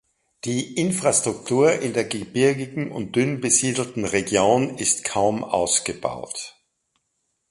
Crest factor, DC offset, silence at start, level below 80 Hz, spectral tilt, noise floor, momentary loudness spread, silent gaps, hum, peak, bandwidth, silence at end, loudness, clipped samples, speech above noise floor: 20 dB; under 0.1%; 0.45 s; -56 dBFS; -3.5 dB/octave; -74 dBFS; 10 LU; none; none; -4 dBFS; 11.5 kHz; 1 s; -22 LUFS; under 0.1%; 52 dB